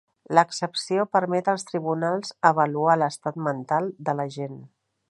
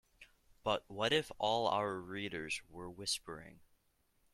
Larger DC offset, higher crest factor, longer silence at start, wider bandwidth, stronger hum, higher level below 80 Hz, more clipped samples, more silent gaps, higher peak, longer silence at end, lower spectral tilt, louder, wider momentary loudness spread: neither; about the same, 22 dB vs 22 dB; about the same, 0.3 s vs 0.2 s; second, 11.5 kHz vs 15.5 kHz; neither; second, -76 dBFS vs -68 dBFS; neither; neither; first, -2 dBFS vs -18 dBFS; second, 0.45 s vs 0.75 s; first, -5 dB/octave vs -3 dB/octave; first, -24 LUFS vs -37 LUFS; about the same, 8 LU vs 9 LU